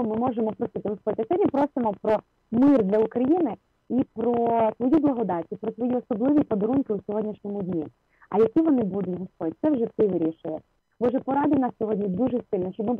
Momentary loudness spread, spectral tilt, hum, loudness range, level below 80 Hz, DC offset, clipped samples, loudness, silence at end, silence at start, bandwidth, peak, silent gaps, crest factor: 9 LU; -10.5 dB/octave; none; 3 LU; -60 dBFS; under 0.1%; under 0.1%; -25 LUFS; 0 s; 0 s; 4.4 kHz; -12 dBFS; none; 12 dB